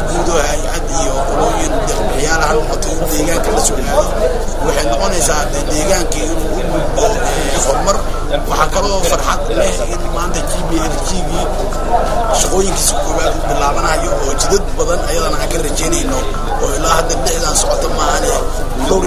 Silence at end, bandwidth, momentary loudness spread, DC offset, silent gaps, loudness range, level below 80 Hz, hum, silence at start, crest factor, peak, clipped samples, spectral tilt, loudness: 0 s; 16 kHz; 5 LU; under 0.1%; none; 1 LU; -20 dBFS; none; 0 s; 14 dB; 0 dBFS; under 0.1%; -3.5 dB/octave; -15 LUFS